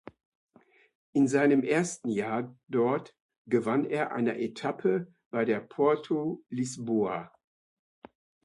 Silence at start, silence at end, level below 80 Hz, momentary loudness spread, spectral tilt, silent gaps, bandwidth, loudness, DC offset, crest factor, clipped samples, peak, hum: 1.15 s; 1.2 s; -74 dBFS; 10 LU; -6 dB/octave; 3.21-3.29 s, 3.38-3.45 s, 5.26-5.31 s; 11.5 kHz; -29 LUFS; under 0.1%; 18 dB; under 0.1%; -12 dBFS; none